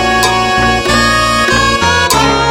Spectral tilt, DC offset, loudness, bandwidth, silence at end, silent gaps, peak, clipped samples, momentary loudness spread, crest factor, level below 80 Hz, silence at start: -3 dB/octave; under 0.1%; -9 LUFS; 19.5 kHz; 0 s; none; 0 dBFS; 0.1%; 1 LU; 10 dB; -26 dBFS; 0 s